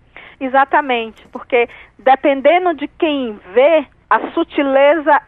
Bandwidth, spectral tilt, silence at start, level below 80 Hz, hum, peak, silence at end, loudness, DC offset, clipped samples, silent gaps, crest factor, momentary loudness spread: 4.2 kHz; -6.5 dB/octave; 0.15 s; -54 dBFS; none; 0 dBFS; 0.05 s; -15 LUFS; under 0.1%; under 0.1%; none; 14 dB; 9 LU